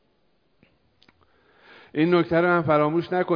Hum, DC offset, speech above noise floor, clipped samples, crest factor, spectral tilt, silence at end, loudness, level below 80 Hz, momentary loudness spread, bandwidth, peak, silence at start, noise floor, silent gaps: none; under 0.1%; 47 dB; under 0.1%; 18 dB; -9.5 dB/octave; 0 s; -22 LUFS; -62 dBFS; 5 LU; 5.2 kHz; -6 dBFS; 1.95 s; -68 dBFS; none